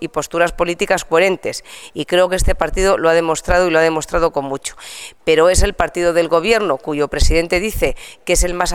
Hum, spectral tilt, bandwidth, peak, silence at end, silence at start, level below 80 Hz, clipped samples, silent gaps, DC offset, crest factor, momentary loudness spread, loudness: none; -4 dB/octave; 18 kHz; 0 dBFS; 0 s; 0 s; -24 dBFS; under 0.1%; none; 0.4%; 16 dB; 12 LU; -16 LUFS